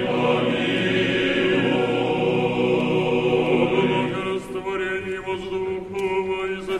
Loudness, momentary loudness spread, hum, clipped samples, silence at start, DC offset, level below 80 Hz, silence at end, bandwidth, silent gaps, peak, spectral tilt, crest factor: -22 LUFS; 8 LU; none; under 0.1%; 0 s; under 0.1%; -50 dBFS; 0 s; 11 kHz; none; -6 dBFS; -6.5 dB/octave; 14 dB